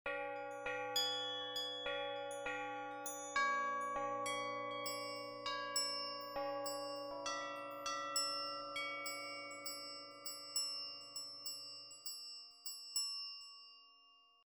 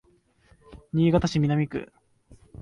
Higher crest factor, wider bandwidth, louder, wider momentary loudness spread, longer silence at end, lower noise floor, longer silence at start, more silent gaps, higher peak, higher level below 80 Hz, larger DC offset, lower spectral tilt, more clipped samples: about the same, 20 dB vs 18 dB; first, over 20 kHz vs 9.2 kHz; second, -42 LUFS vs -25 LUFS; second, 10 LU vs 13 LU; first, 0.2 s vs 0 s; first, -68 dBFS vs -62 dBFS; second, 0.05 s vs 0.7 s; neither; second, -24 dBFS vs -8 dBFS; second, -78 dBFS vs -48 dBFS; neither; second, -0.5 dB/octave vs -7.5 dB/octave; neither